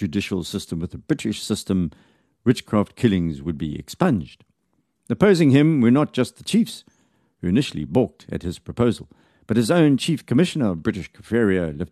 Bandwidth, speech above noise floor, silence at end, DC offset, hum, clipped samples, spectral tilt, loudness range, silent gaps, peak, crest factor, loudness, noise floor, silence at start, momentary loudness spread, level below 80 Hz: 13 kHz; 50 dB; 0.05 s; under 0.1%; none; under 0.1%; -6.5 dB/octave; 4 LU; none; -2 dBFS; 20 dB; -21 LUFS; -70 dBFS; 0 s; 14 LU; -48 dBFS